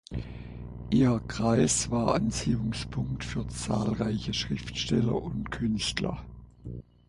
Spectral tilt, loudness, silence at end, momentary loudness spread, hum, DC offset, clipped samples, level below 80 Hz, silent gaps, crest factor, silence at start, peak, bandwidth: -5 dB/octave; -29 LUFS; 0.25 s; 17 LU; 60 Hz at -40 dBFS; under 0.1%; under 0.1%; -44 dBFS; none; 18 dB; 0.1 s; -10 dBFS; 11.5 kHz